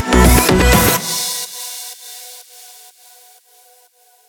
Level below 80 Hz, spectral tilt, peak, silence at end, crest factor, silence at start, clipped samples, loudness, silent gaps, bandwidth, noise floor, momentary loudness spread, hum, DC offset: -22 dBFS; -4 dB/octave; 0 dBFS; 1.9 s; 16 dB; 0 s; under 0.1%; -13 LUFS; none; over 20 kHz; -52 dBFS; 24 LU; none; under 0.1%